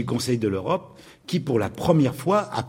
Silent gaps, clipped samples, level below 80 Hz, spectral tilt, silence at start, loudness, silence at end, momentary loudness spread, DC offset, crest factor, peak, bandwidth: none; under 0.1%; -52 dBFS; -6.5 dB/octave; 0 s; -24 LUFS; 0 s; 8 LU; under 0.1%; 20 dB; -4 dBFS; 16.5 kHz